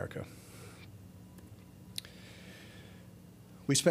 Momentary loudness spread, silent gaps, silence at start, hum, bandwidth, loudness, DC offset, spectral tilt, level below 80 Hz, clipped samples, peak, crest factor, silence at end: 14 LU; none; 0 s; none; 15.5 kHz; -39 LUFS; under 0.1%; -4 dB/octave; -66 dBFS; under 0.1%; -14 dBFS; 26 dB; 0 s